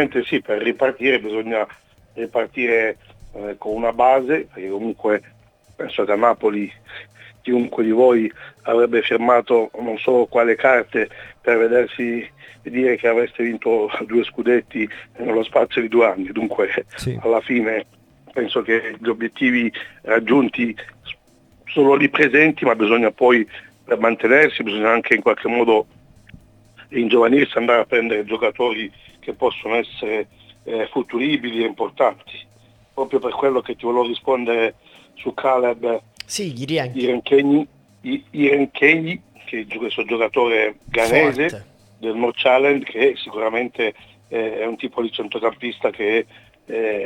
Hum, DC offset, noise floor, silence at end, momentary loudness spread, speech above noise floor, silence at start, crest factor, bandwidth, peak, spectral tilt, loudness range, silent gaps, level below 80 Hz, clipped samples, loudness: none; under 0.1%; -53 dBFS; 0 s; 14 LU; 35 dB; 0 s; 20 dB; 13 kHz; 0 dBFS; -5.5 dB/octave; 6 LU; none; -56 dBFS; under 0.1%; -19 LUFS